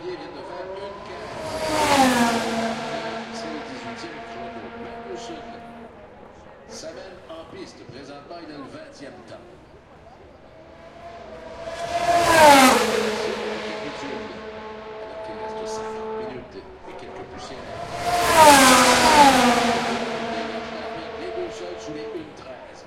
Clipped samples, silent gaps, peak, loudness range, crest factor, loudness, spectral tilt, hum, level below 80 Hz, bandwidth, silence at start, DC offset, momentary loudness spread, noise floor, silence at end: under 0.1%; none; 0 dBFS; 23 LU; 22 dB; -19 LUFS; -2.5 dB/octave; none; -50 dBFS; 16.5 kHz; 0 s; under 0.1%; 26 LU; -47 dBFS; 0 s